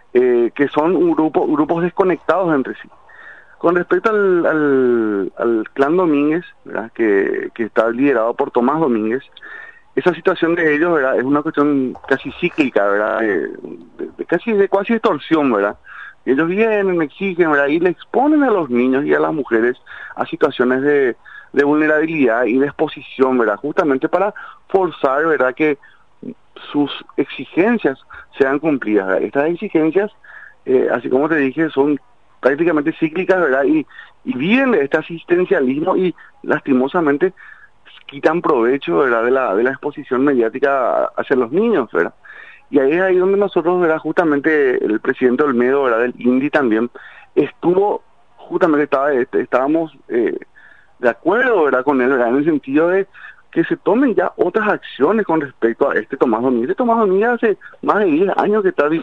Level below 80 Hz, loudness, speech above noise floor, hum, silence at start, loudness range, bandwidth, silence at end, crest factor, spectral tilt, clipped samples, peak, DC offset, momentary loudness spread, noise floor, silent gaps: -60 dBFS; -16 LUFS; 31 dB; none; 0.15 s; 2 LU; 6.6 kHz; 0 s; 16 dB; -8 dB/octave; under 0.1%; -2 dBFS; 0.4%; 8 LU; -47 dBFS; none